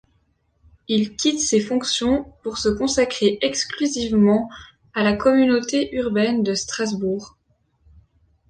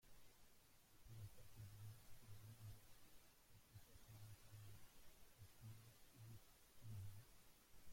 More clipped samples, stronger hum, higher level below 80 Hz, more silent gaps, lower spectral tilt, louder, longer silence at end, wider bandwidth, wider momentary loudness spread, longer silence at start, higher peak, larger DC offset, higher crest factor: neither; neither; first, -48 dBFS vs -74 dBFS; neither; about the same, -4 dB/octave vs -4.5 dB/octave; first, -20 LUFS vs -64 LUFS; first, 1.2 s vs 0 s; second, 10 kHz vs 16.5 kHz; about the same, 7 LU vs 8 LU; first, 0.9 s vs 0 s; first, -4 dBFS vs -46 dBFS; neither; about the same, 16 dB vs 16 dB